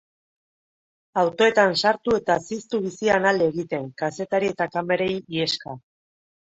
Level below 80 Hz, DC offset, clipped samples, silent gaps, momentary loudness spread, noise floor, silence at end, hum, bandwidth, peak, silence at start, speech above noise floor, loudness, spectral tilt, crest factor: -60 dBFS; under 0.1%; under 0.1%; none; 10 LU; under -90 dBFS; 0.7 s; none; 8.2 kHz; -4 dBFS; 1.15 s; over 68 dB; -23 LUFS; -4.5 dB/octave; 20 dB